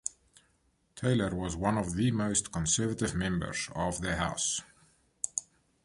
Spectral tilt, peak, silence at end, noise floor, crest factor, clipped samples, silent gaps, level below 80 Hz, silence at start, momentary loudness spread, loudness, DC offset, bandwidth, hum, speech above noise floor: -4 dB/octave; -10 dBFS; 0.4 s; -72 dBFS; 22 dB; under 0.1%; none; -50 dBFS; 0.05 s; 6 LU; -31 LUFS; under 0.1%; 11.5 kHz; none; 41 dB